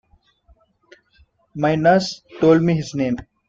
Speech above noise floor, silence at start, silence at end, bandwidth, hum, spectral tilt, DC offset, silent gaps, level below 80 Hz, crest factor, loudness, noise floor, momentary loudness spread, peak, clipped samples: 41 dB; 1.55 s; 0.25 s; 7.8 kHz; none; -6.5 dB/octave; under 0.1%; none; -52 dBFS; 18 dB; -18 LUFS; -58 dBFS; 10 LU; -4 dBFS; under 0.1%